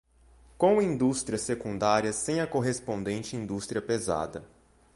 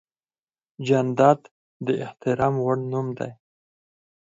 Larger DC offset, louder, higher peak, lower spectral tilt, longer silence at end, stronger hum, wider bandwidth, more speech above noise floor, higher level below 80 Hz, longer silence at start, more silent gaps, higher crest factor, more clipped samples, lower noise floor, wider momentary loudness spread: neither; second, -29 LUFS vs -23 LUFS; second, -10 dBFS vs -4 dBFS; second, -5 dB/octave vs -7.5 dB/octave; second, 0.5 s vs 0.9 s; neither; first, 11.5 kHz vs 7.8 kHz; second, 30 dB vs over 68 dB; first, -56 dBFS vs -62 dBFS; second, 0.6 s vs 0.8 s; second, none vs 1.51-1.80 s; about the same, 20 dB vs 20 dB; neither; second, -58 dBFS vs under -90 dBFS; second, 9 LU vs 14 LU